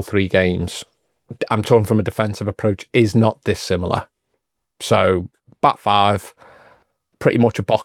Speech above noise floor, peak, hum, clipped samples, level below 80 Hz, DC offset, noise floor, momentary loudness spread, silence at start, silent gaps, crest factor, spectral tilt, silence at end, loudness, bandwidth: 57 dB; 0 dBFS; none; under 0.1%; -52 dBFS; under 0.1%; -74 dBFS; 9 LU; 0 s; none; 18 dB; -6 dB/octave; 0 s; -18 LUFS; 15.5 kHz